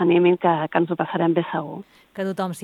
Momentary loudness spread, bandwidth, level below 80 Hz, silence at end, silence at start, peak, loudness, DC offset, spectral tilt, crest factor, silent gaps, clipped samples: 17 LU; 12 kHz; -70 dBFS; 0 s; 0 s; -6 dBFS; -22 LUFS; under 0.1%; -7 dB/octave; 16 dB; none; under 0.1%